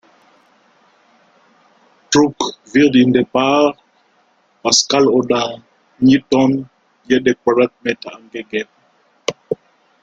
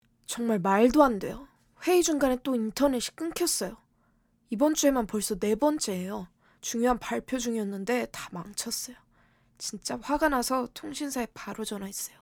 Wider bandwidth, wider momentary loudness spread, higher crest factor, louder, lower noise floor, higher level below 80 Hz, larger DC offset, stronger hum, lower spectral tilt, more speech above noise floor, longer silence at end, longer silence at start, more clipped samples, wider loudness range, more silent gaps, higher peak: second, 9.2 kHz vs over 20 kHz; about the same, 15 LU vs 14 LU; about the same, 18 dB vs 22 dB; first, -16 LUFS vs -28 LUFS; second, -57 dBFS vs -68 dBFS; about the same, -56 dBFS vs -54 dBFS; neither; neither; about the same, -4 dB/octave vs -3.5 dB/octave; about the same, 43 dB vs 40 dB; first, 0.5 s vs 0.15 s; first, 2.1 s vs 0.3 s; neither; about the same, 4 LU vs 6 LU; neither; first, 0 dBFS vs -6 dBFS